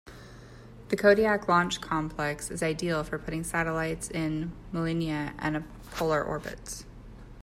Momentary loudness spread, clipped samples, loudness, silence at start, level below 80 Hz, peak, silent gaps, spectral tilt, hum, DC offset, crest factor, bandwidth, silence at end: 24 LU; under 0.1%; -29 LUFS; 0.05 s; -48 dBFS; -8 dBFS; none; -5 dB/octave; none; under 0.1%; 22 dB; 16 kHz; 0 s